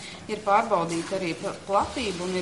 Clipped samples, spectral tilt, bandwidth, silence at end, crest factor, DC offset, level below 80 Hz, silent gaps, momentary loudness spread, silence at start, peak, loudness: under 0.1%; -4.5 dB/octave; 11.5 kHz; 0 s; 18 dB; 0.1%; -54 dBFS; none; 9 LU; 0 s; -8 dBFS; -26 LUFS